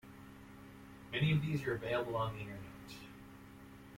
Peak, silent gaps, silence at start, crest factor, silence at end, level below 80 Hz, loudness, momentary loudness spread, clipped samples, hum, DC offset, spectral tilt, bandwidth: -22 dBFS; none; 0.05 s; 18 dB; 0 s; -62 dBFS; -37 LUFS; 22 LU; under 0.1%; none; under 0.1%; -7 dB/octave; 16.5 kHz